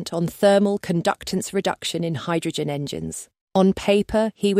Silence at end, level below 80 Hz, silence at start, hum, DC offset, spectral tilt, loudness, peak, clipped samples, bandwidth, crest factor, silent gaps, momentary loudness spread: 0 s; -50 dBFS; 0 s; none; under 0.1%; -5.5 dB/octave; -22 LUFS; -6 dBFS; under 0.1%; 16 kHz; 16 dB; 3.41-3.47 s; 10 LU